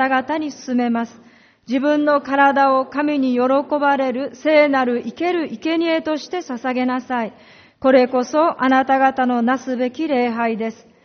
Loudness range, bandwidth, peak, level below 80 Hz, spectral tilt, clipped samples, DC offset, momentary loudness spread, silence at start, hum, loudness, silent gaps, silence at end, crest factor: 3 LU; 6.6 kHz; -2 dBFS; -64 dBFS; -2.5 dB/octave; under 0.1%; under 0.1%; 10 LU; 0 s; none; -18 LUFS; none; 0.3 s; 16 dB